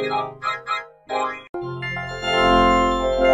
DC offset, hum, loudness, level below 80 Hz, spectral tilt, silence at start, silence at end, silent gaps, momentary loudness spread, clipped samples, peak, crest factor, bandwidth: under 0.1%; none; -21 LUFS; -36 dBFS; -5 dB/octave; 0 s; 0 s; 1.49-1.54 s; 13 LU; under 0.1%; -6 dBFS; 16 dB; 11.5 kHz